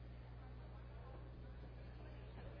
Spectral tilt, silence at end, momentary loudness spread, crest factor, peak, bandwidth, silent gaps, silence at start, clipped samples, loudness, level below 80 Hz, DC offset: -6.5 dB/octave; 0 s; 1 LU; 14 dB; -40 dBFS; 5.2 kHz; none; 0 s; under 0.1%; -56 LUFS; -56 dBFS; under 0.1%